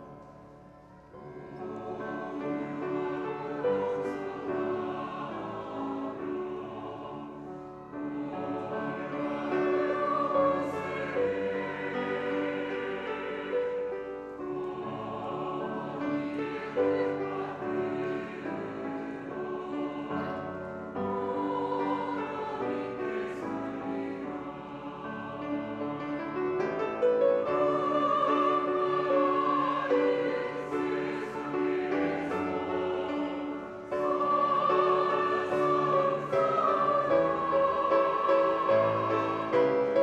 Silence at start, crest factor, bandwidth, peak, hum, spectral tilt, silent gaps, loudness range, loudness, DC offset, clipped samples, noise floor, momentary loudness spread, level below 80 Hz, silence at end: 0 s; 16 dB; 9 kHz; -14 dBFS; none; -7 dB/octave; none; 9 LU; -30 LUFS; under 0.1%; under 0.1%; -52 dBFS; 12 LU; -66 dBFS; 0 s